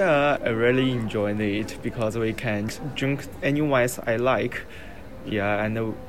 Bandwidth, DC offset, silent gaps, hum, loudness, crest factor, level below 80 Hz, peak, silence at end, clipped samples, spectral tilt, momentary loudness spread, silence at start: 16 kHz; 0.8%; none; none; -25 LUFS; 16 dB; -48 dBFS; -8 dBFS; 0 s; under 0.1%; -6 dB/octave; 10 LU; 0 s